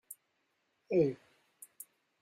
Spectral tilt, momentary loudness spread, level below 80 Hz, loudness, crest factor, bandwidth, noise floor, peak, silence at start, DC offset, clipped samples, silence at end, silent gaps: -7 dB/octave; 24 LU; -76 dBFS; -33 LUFS; 22 dB; 15.5 kHz; -79 dBFS; -18 dBFS; 0.1 s; under 0.1%; under 0.1%; 1.05 s; none